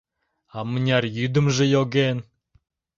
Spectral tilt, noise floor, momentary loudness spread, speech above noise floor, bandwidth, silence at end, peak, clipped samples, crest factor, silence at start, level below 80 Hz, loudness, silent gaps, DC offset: -6 dB/octave; -63 dBFS; 13 LU; 42 dB; 7.4 kHz; 0.75 s; -4 dBFS; under 0.1%; 18 dB; 0.55 s; -58 dBFS; -22 LUFS; none; under 0.1%